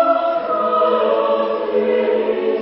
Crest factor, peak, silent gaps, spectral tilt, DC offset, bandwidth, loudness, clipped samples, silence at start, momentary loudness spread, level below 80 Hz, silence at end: 12 dB; -4 dBFS; none; -10 dB/octave; under 0.1%; 5.8 kHz; -17 LUFS; under 0.1%; 0 s; 3 LU; -60 dBFS; 0 s